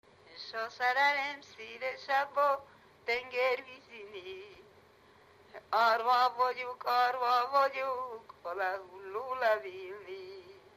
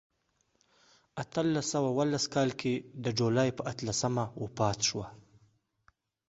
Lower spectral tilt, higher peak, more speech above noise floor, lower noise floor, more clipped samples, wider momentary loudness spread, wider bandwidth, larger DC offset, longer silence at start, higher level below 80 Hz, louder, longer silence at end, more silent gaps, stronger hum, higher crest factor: second, -2.5 dB/octave vs -4.5 dB/octave; second, -16 dBFS vs -12 dBFS; second, 29 dB vs 44 dB; second, -61 dBFS vs -75 dBFS; neither; first, 19 LU vs 9 LU; first, 15 kHz vs 8.2 kHz; neither; second, 0.3 s vs 1.15 s; second, -78 dBFS vs -62 dBFS; about the same, -31 LUFS vs -31 LUFS; second, 0.2 s vs 1.1 s; neither; neither; about the same, 18 dB vs 20 dB